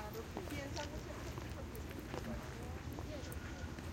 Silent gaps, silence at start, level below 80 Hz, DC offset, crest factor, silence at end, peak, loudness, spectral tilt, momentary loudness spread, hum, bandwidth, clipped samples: none; 0 s; -52 dBFS; under 0.1%; 18 dB; 0 s; -26 dBFS; -46 LUFS; -5 dB/octave; 3 LU; none; 17 kHz; under 0.1%